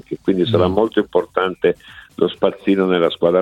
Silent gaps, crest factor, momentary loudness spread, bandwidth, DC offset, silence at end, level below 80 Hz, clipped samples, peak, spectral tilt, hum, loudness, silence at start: none; 16 dB; 6 LU; 9.4 kHz; under 0.1%; 0 s; -50 dBFS; under 0.1%; 0 dBFS; -8 dB/octave; none; -18 LUFS; 0.1 s